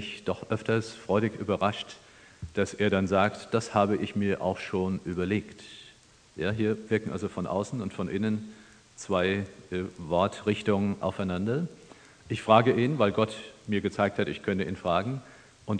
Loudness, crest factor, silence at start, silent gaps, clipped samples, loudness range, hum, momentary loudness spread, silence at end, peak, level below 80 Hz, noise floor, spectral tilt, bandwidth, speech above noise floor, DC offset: -29 LUFS; 24 dB; 0 s; none; under 0.1%; 5 LU; none; 12 LU; 0 s; -6 dBFS; -60 dBFS; -57 dBFS; -6.5 dB/octave; 10 kHz; 28 dB; under 0.1%